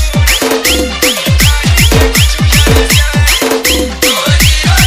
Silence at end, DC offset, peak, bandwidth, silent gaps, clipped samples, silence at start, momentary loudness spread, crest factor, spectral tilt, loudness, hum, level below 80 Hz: 0 s; under 0.1%; 0 dBFS; over 20 kHz; none; 1%; 0 s; 3 LU; 8 dB; -3.5 dB/octave; -8 LUFS; none; -14 dBFS